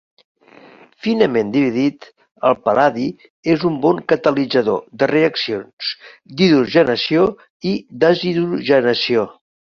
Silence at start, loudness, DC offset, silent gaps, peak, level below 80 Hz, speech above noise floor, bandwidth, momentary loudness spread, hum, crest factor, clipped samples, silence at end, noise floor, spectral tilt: 1.05 s; -17 LUFS; under 0.1%; 3.30-3.43 s, 5.73-5.77 s, 7.50-7.60 s; -2 dBFS; -56 dBFS; 28 dB; 7 kHz; 10 LU; none; 16 dB; under 0.1%; 0.4 s; -45 dBFS; -6.5 dB/octave